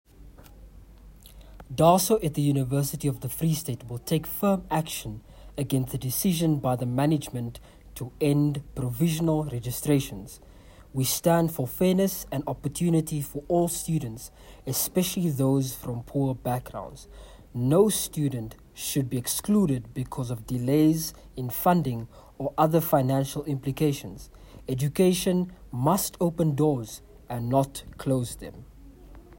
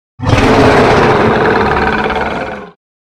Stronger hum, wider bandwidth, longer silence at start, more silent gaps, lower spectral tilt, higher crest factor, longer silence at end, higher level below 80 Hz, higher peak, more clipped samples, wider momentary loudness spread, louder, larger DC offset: neither; first, 16.5 kHz vs 13 kHz; about the same, 0.2 s vs 0.2 s; neither; about the same, -6 dB/octave vs -6 dB/octave; first, 22 dB vs 10 dB; second, 0 s vs 0.5 s; second, -50 dBFS vs -26 dBFS; second, -6 dBFS vs 0 dBFS; neither; first, 15 LU vs 12 LU; second, -26 LUFS vs -10 LUFS; neither